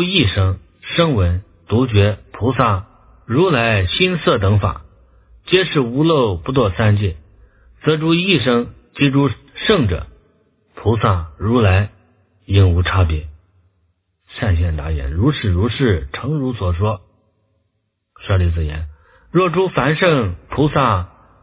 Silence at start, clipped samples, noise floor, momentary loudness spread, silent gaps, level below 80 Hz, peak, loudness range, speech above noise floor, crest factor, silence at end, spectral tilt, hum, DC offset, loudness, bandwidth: 0 s; under 0.1%; -70 dBFS; 10 LU; none; -28 dBFS; 0 dBFS; 4 LU; 54 dB; 18 dB; 0.35 s; -11 dB/octave; none; under 0.1%; -17 LUFS; 4 kHz